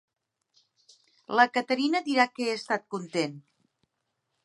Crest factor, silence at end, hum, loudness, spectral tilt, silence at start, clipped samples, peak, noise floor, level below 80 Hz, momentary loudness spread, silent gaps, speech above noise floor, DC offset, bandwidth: 24 dB; 1.05 s; none; -27 LUFS; -4 dB/octave; 1.3 s; under 0.1%; -6 dBFS; -80 dBFS; -84 dBFS; 8 LU; none; 54 dB; under 0.1%; 11.5 kHz